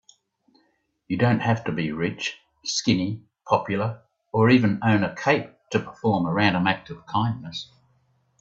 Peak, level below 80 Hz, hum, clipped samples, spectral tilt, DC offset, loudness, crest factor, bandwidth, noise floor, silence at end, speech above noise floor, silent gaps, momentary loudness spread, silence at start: -4 dBFS; -60 dBFS; none; under 0.1%; -5.5 dB/octave; under 0.1%; -24 LUFS; 20 dB; 7.8 kHz; -68 dBFS; 0.75 s; 45 dB; none; 12 LU; 1.1 s